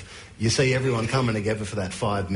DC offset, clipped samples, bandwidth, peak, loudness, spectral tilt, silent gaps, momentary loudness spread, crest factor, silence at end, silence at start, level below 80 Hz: under 0.1%; under 0.1%; 11 kHz; -12 dBFS; -24 LUFS; -5 dB/octave; none; 7 LU; 14 dB; 0 s; 0 s; -48 dBFS